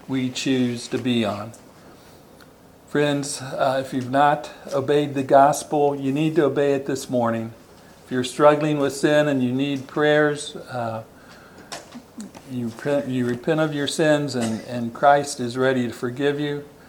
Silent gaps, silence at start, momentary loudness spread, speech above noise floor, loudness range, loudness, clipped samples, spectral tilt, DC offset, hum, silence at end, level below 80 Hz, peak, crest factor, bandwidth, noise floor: none; 0.1 s; 13 LU; 27 dB; 6 LU; -22 LUFS; under 0.1%; -5.5 dB/octave; under 0.1%; none; 0.2 s; -62 dBFS; -2 dBFS; 20 dB; 19 kHz; -48 dBFS